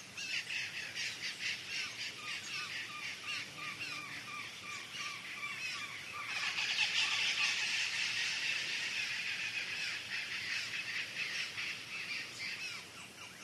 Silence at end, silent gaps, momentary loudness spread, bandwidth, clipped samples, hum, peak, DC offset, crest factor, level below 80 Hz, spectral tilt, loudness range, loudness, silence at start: 0 s; none; 11 LU; 13 kHz; under 0.1%; none; -20 dBFS; under 0.1%; 20 dB; -82 dBFS; 0.5 dB/octave; 8 LU; -37 LUFS; 0 s